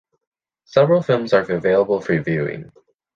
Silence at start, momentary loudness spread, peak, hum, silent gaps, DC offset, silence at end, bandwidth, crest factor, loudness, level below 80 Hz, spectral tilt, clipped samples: 0.75 s; 8 LU; -2 dBFS; none; none; under 0.1%; 0.5 s; 7.2 kHz; 18 dB; -18 LUFS; -56 dBFS; -7.5 dB/octave; under 0.1%